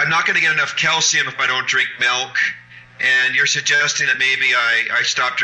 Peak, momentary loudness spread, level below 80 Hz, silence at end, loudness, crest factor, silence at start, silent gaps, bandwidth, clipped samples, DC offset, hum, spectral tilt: -6 dBFS; 4 LU; -64 dBFS; 0 s; -15 LUFS; 12 dB; 0 s; none; 8.8 kHz; under 0.1%; under 0.1%; none; 0 dB/octave